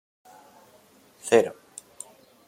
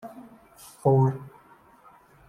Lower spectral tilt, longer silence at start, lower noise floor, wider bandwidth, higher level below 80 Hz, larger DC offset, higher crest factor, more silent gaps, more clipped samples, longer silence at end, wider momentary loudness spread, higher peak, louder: second, -3.5 dB/octave vs -9.5 dB/octave; first, 1.25 s vs 0.05 s; about the same, -57 dBFS vs -55 dBFS; first, 16 kHz vs 13.5 kHz; second, -76 dBFS vs -64 dBFS; neither; about the same, 24 dB vs 20 dB; neither; neither; about the same, 0.95 s vs 1 s; second, 23 LU vs 26 LU; first, -4 dBFS vs -8 dBFS; about the same, -23 LUFS vs -24 LUFS